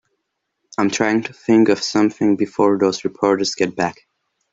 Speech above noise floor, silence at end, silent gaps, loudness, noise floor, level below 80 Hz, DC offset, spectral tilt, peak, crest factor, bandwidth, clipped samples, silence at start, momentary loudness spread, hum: 58 dB; 0.6 s; none; -18 LUFS; -75 dBFS; -60 dBFS; under 0.1%; -4.5 dB/octave; 0 dBFS; 18 dB; 7.8 kHz; under 0.1%; 0.8 s; 7 LU; none